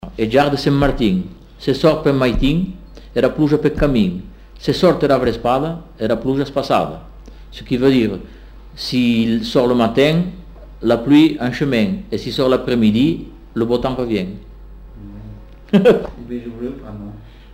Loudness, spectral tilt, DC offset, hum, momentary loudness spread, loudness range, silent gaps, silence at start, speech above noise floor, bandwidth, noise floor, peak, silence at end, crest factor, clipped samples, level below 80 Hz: -17 LUFS; -7 dB/octave; under 0.1%; none; 17 LU; 4 LU; none; 0.05 s; 20 dB; 16 kHz; -36 dBFS; -2 dBFS; 0 s; 16 dB; under 0.1%; -34 dBFS